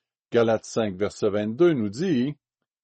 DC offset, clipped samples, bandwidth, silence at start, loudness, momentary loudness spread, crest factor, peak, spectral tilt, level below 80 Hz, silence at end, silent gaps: under 0.1%; under 0.1%; 8.4 kHz; 0.3 s; -24 LUFS; 7 LU; 16 dB; -8 dBFS; -6.5 dB/octave; -64 dBFS; 0.5 s; none